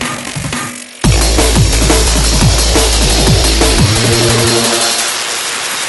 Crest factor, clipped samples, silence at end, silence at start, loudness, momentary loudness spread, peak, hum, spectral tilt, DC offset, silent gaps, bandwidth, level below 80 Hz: 10 dB; under 0.1%; 0 s; 0 s; -10 LUFS; 9 LU; 0 dBFS; none; -3.5 dB/octave; under 0.1%; none; 12 kHz; -16 dBFS